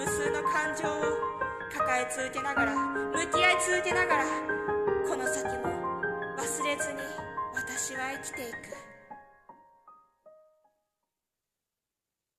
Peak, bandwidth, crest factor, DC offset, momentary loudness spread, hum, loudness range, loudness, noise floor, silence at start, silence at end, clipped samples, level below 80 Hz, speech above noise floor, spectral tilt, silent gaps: -10 dBFS; 14 kHz; 22 dB; under 0.1%; 11 LU; none; 11 LU; -30 LUFS; -89 dBFS; 0 s; 2.05 s; under 0.1%; -60 dBFS; 59 dB; -2.5 dB/octave; none